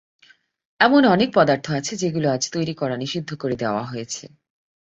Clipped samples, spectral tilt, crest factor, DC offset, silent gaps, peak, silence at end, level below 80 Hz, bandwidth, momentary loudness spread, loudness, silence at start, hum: under 0.1%; -4.5 dB/octave; 20 dB; under 0.1%; none; -2 dBFS; 0.6 s; -60 dBFS; 8 kHz; 13 LU; -21 LUFS; 0.8 s; none